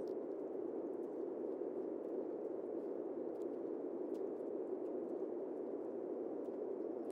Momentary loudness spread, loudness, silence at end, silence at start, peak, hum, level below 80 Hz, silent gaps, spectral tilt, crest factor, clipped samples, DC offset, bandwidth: 1 LU; -44 LUFS; 0 s; 0 s; -30 dBFS; none; under -90 dBFS; none; -9 dB/octave; 14 dB; under 0.1%; under 0.1%; 5.6 kHz